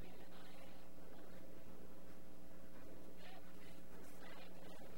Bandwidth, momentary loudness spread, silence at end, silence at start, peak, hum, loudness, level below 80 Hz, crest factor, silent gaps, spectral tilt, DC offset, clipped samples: 16 kHz; 3 LU; 0 s; 0 s; -38 dBFS; none; -60 LUFS; -72 dBFS; 14 dB; none; -5 dB/octave; 0.8%; under 0.1%